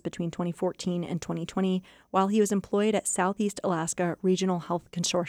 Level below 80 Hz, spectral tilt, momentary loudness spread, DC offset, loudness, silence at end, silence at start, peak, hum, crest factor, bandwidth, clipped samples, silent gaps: -64 dBFS; -5 dB/octave; 7 LU; under 0.1%; -28 LUFS; 0 s; 0.05 s; -12 dBFS; none; 16 dB; 15 kHz; under 0.1%; none